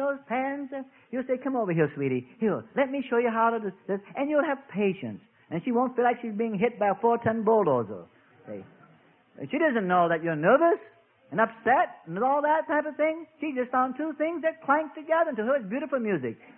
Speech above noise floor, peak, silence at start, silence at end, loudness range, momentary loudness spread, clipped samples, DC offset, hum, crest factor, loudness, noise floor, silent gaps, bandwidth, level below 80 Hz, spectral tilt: 33 dB; -8 dBFS; 0 s; 0.05 s; 3 LU; 11 LU; under 0.1%; under 0.1%; none; 20 dB; -27 LUFS; -59 dBFS; none; 3.6 kHz; -72 dBFS; -11 dB/octave